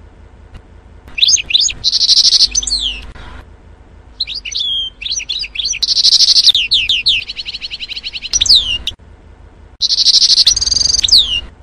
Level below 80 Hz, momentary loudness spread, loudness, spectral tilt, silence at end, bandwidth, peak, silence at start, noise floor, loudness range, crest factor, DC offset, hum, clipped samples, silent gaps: -36 dBFS; 16 LU; -9 LUFS; 2 dB/octave; 0.15 s; over 20 kHz; 0 dBFS; 0.55 s; -39 dBFS; 5 LU; 14 dB; under 0.1%; none; under 0.1%; none